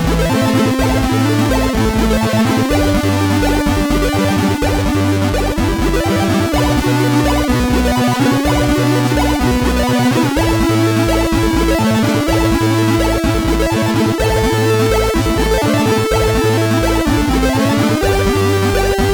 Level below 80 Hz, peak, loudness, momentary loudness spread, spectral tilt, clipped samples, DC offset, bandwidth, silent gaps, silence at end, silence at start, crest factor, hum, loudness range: -22 dBFS; -4 dBFS; -14 LUFS; 2 LU; -5.5 dB/octave; under 0.1%; under 0.1%; over 20 kHz; none; 0 s; 0 s; 10 dB; none; 1 LU